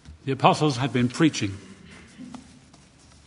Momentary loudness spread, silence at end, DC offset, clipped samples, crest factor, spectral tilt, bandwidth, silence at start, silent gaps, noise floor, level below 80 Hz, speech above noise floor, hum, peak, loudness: 24 LU; 0.85 s; under 0.1%; under 0.1%; 24 dB; -5.5 dB/octave; 11 kHz; 0.1 s; none; -53 dBFS; -54 dBFS; 30 dB; none; -2 dBFS; -23 LUFS